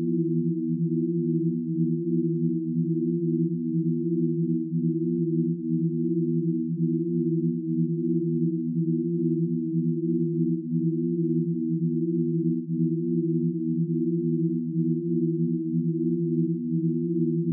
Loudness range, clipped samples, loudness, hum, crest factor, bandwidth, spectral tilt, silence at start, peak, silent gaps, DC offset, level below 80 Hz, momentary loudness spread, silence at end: 0 LU; under 0.1%; -26 LUFS; none; 12 dB; 0.4 kHz; -18 dB/octave; 0 s; -14 dBFS; none; under 0.1%; under -90 dBFS; 1 LU; 0 s